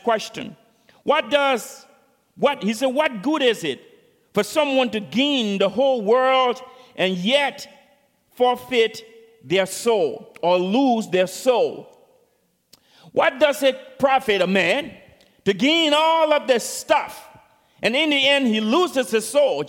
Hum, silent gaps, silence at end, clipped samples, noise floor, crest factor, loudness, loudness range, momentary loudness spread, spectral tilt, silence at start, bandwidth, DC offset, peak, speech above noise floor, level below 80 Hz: none; none; 0 s; under 0.1%; -65 dBFS; 18 dB; -20 LUFS; 4 LU; 10 LU; -3.5 dB/octave; 0.05 s; 17 kHz; under 0.1%; -2 dBFS; 46 dB; -66 dBFS